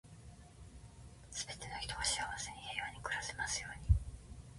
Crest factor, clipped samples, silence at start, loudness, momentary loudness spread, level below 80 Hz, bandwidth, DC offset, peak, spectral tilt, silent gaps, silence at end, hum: 24 dB; under 0.1%; 0.05 s; -39 LUFS; 21 LU; -46 dBFS; 11.5 kHz; under 0.1%; -18 dBFS; -2 dB/octave; none; 0 s; none